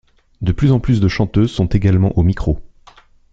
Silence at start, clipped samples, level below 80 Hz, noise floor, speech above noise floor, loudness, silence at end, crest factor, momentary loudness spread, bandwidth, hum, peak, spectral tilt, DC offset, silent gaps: 0.4 s; under 0.1%; -28 dBFS; -47 dBFS; 32 dB; -16 LUFS; 0.65 s; 14 dB; 8 LU; 7.6 kHz; none; -2 dBFS; -8.5 dB/octave; under 0.1%; none